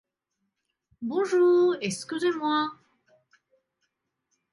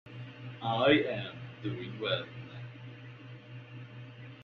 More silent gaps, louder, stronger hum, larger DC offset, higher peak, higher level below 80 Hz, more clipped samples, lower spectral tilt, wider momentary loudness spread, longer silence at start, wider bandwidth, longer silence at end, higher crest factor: neither; first, -25 LUFS vs -32 LUFS; neither; neither; about the same, -14 dBFS vs -12 dBFS; second, -78 dBFS vs -70 dBFS; neither; about the same, -4.5 dB/octave vs -3.5 dB/octave; second, 11 LU vs 22 LU; first, 1 s vs 0.05 s; first, 11.5 kHz vs 6.4 kHz; first, 1.8 s vs 0 s; second, 14 dB vs 24 dB